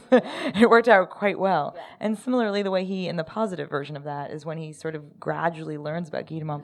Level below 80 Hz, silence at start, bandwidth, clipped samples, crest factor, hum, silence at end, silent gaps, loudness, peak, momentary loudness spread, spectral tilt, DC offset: -68 dBFS; 0.1 s; 12 kHz; under 0.1%; 22 dB; none; 0 s; none; -25 LUFS; -2 dBFS; 16 LU; -6.5 dB/octave; under 0.1%